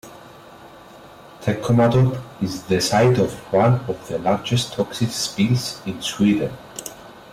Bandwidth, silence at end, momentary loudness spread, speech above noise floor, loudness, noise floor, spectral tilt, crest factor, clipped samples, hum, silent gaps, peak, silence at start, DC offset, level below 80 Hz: 16 kHz; 0 s; 13 LU; 24 dB; -20 LUFS; -43 dBFS; -5.5 dB/octave; 14 dB; under 0.1%; none; none; -8 dBFS; 0.05 s; under 0.1%; -52 dBFS